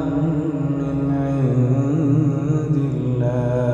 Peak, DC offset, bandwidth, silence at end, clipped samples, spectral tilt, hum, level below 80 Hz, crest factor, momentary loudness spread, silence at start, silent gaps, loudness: -6 dBFS; under 0.1%; 7.4 kHz; 0 s; under 0.1%; -10 dB/octave; none; -42 dBFS; 12 dB; 4 LU; 0 s; none; -20 LUFS